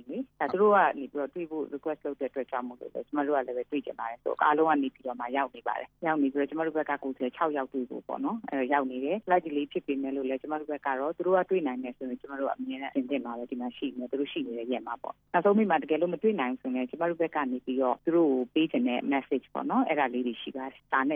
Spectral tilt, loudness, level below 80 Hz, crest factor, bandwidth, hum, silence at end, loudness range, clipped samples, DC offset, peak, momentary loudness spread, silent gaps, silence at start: -8.5 dB/octave; -30 LUFS; -72 dBFS; 20 dB; 4.5 kHz; none; 0 s; 4 LU; under 0.1%; under 0.1%; -10 dBFS; 10 LU; none; 0.05 s